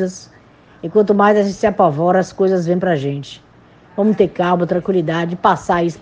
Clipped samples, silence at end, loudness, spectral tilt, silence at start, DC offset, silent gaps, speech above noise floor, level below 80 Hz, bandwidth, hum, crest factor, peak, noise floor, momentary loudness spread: under 0.1%; 0.05 s; -16 LUFS; -7 dB/octave; 0 s; under 0.1%; none; 30 dB; -52 dBFS; 9.2 kHz; none; 16 dB; 0 dBFS; -46 dBFS; 11 LU